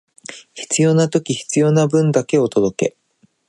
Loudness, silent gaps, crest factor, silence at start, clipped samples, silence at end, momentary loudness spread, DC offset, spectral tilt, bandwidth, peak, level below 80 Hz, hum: -17 LUFS; none; 16 dB; 0.3 s; under 0.1%; 0.6 s; 18 LU; under 0.1%; -5.5 dB/octave; 11.5 kHz; -2 dBFS; -60 dBFS; none